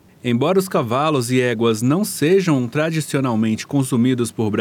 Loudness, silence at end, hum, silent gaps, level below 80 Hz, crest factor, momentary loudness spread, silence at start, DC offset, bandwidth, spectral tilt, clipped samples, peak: -18 LUFS; 0 s; none; none; -64 dBFS; 12 dB; 4 LU; 0.25 s; under 0.1%; 18 kHz; -6 dB/octave; under 0.1%; -6 dBFS